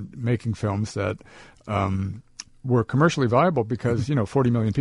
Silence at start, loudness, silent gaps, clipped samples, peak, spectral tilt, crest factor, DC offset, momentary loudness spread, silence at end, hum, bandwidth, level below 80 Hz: 0 s; -24 LUFS; none; under 0.1%; -6 dBFS; -7 dB/octave; 18 dB; under 0.1%; 15 LU; 0 s; none; 11 kHz; -52 dBFS